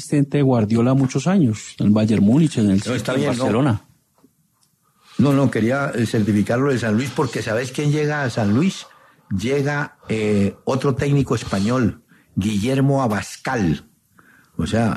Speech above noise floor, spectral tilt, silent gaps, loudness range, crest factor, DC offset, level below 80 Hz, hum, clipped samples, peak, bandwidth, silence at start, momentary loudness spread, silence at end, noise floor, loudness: 44 dB; -6.5 dB/octave; none; 4 LU; 14 dB; under 0.1%; -52 dBFS; none; under 0.1%; -6 dBFS; 13 kHz; 0 s; 8 LU; 0 s; -63 dBFS; -19 LUFS